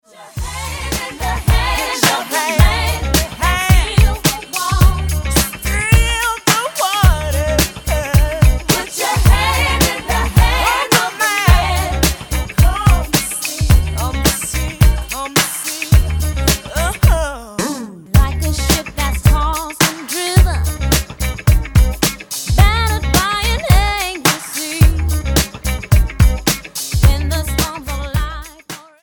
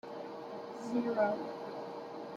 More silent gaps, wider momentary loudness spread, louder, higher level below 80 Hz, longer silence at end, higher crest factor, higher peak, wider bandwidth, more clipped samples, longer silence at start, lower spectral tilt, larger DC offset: neither; second, 8 LU vs 12 LU; first, -15 LUFS vs -38 LUFS; first, -18 dBFS vs -82 dBFS; first, 0.25 s vs 0 s; about the same, 14 dB vs 18 dB; first, 0 dBFS vs -20 dBFS; first, 17.5 kHz vs 12 kHz; neither; first, 0.2 s vs 0.05 s; second, -4 dB/octave vs -6.5 dB/octave; neither